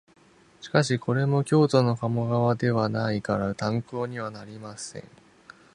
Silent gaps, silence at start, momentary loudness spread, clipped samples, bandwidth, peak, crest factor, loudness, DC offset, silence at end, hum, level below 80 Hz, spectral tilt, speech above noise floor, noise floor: none; 0.6 s; 16 LU; under 0.1%; 11 kHz; -4 dBFS; 22 dB; -25 LUFS; under 0.1%; 0.75 s; none; -58 dBFS; -6.5 dB/octave; 27 dB; -52 dBFS